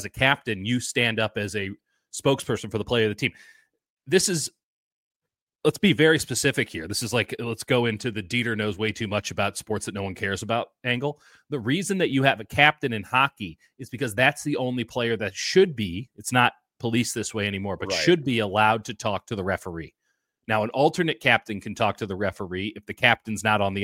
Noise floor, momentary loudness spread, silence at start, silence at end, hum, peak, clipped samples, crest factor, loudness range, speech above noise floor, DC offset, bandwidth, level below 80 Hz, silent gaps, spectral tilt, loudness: -76 dBFS; 11 LU; 0 s; 0 s; none; 0 dBFS; under 0.1%; 24 dB; 4 LU; 51 dB; under 0.1%; 16.5 kHz; -58 dBFS; 3.90-3.97 s, 4.63-5.20 s, 5.42-5.47 s; -4 dB/octave; -24 LUFS